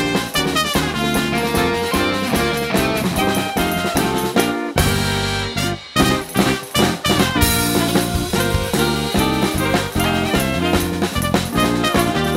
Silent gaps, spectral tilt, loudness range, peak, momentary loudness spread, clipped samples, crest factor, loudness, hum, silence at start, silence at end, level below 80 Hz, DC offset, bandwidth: none; -4 dB/octave; 1 LU; 0 dBFS; 3 LU; under 0.1%; 18 dB; -18 LUFS; none; 0 s; 0 s; -32 dBFS; under 0.1%; 16.5 kHz